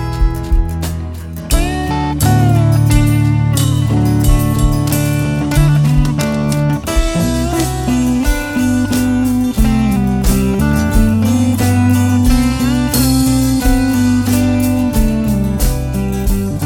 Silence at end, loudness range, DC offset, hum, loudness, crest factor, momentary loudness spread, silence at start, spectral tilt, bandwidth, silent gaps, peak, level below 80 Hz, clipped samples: 0 s; 2 LU; under 0.1%; none; -14 LUFS; 12 dB; 6 LU; 0 s; -6 dB/octave; 17.5 kHz; none; 0 dBFS; -18 dBFS; under 0.1%